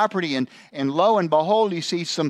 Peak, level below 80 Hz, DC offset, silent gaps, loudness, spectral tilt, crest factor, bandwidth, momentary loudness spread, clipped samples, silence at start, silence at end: -6 dBFS; -76 dBFS; under 0.1%; none; -21 LUFS; -5 dB/octave; 16 dB; 12 kHz; 9 LU; under 0.1%; 0 s; 0 s